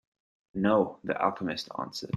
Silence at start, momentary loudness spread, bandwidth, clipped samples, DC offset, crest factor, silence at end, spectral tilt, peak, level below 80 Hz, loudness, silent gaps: 0.55 s; 11 LU; 12.5 kHz; under 0.1%; under 0.1%; 20 dB; 0 s; -6 dB/octave; -10 dBFS; -68 dBFS; -29 LUFS; none